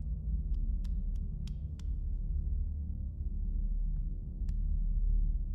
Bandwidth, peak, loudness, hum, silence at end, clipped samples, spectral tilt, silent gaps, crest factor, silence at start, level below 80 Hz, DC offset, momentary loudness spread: 0.7 kHz; -22 dBFS; -38 LUFS; none; 0 s; under 0.1%; -9.5 dB/octave; none; 10 dB; 0 s; -34 dBFS; under 0.1%; 5 LU